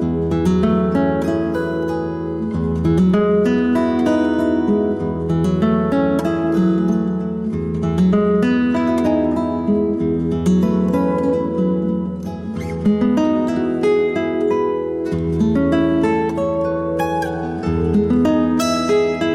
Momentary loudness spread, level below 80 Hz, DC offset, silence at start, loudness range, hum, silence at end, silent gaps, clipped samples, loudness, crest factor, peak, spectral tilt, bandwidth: 6 LU; -38 dBFS; under 0.1%; 0 s; 2 LU; none; 0 s; none; under 0.1%; -18 LUFS; 10 dB; -8 dBFS; -7.5 dB/octave; 13.5 kHz